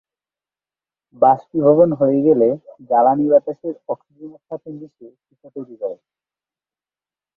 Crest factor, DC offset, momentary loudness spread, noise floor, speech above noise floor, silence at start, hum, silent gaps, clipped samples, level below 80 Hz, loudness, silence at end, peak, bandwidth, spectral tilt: 18 dB; under 0.1%; 20 LU; under -90 dBFS; over 72 dB; 1.2 s; none; none; under 0.1%; -64 dBFS; -16 LUFS; 1.45 s; -2 dBFS; 3 kHz; -12 dB/octave